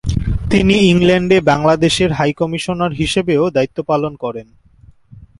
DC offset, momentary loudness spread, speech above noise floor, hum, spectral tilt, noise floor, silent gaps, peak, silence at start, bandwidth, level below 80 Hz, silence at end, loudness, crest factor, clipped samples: under 0.1%; 9 LU; 32 dB; none; -6 dB/octave; -46 dBFS; none; 0 dBFS; 0.05 s; 11.5 kHz; -30 dBFS; 0.15 s; -14 LUFS; 14 dB; under 0.1%